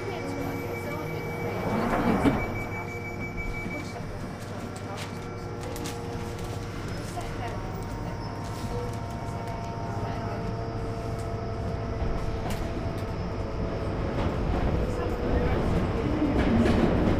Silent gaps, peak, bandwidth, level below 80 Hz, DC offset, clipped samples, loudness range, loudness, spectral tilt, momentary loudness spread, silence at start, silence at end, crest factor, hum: none; -10 dBFS; 15.5 kHz; -36 dBFS; under 0.1%; under 0.1%; 7 LU; -30 LUFS; -7 dB/octave; 10 LU; 0 s; 0 s; 18 dB; none